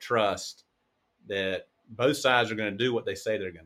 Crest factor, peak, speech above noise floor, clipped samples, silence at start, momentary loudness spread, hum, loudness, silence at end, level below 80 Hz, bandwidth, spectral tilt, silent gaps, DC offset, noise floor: 20 dB; -8 dBFS; 47 dB; under 0.1%; 0 s; 12 LU; none; -28 LUFS; 0.05 s; -68 dBFS; 15.5 kHz; -4 dB/octave; none; under 0.1%; -75 dBFS